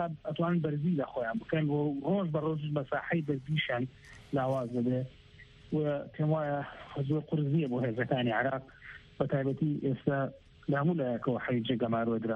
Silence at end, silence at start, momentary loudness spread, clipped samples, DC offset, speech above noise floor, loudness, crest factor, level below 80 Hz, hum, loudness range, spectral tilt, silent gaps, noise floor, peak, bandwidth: 0 s; 0 s; 6 LU; under 0.1%; under 0.1%; 24 dB; -32 LUFS; 16 dB; -64 dBFS; none; 2 LU; -9 dB/octave; none; -55 dBFS; -16 dBFS; 5.4 kHz